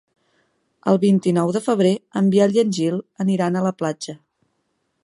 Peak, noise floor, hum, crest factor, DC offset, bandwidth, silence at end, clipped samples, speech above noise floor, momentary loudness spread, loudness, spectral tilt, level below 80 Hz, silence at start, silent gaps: -2 dBFS; -71 dBFS; none; 18 dB; under 0.1%; 11.5 kHz; 0.9 s; under 0.1%; 52 dB; 9 LU; -19 LUFS; -7 dB/octave; -68 dBFS; 0.85 s; none